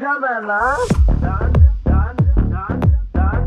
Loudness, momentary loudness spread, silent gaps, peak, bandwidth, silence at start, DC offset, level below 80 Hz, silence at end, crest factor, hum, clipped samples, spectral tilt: -17 LUFS; 5 LU; none; 0 dBFS; 9.8 kHz; 0 s; under 0.1%; -18 dBFS; 0 s; 14 dB; none; under 0.1%; -8 dB/octave